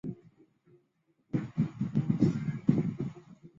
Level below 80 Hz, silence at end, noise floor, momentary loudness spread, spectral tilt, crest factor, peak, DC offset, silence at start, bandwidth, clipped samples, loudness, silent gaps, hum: -60 dBFS; 0.1 s; -74 dBFS; 14 LU; -9.5 dB/octave; 22 dB; -10 dBFS; under 0.1%; 0.05 s; 7.4 kHz; under 0.1%; -32 LUFS; none; none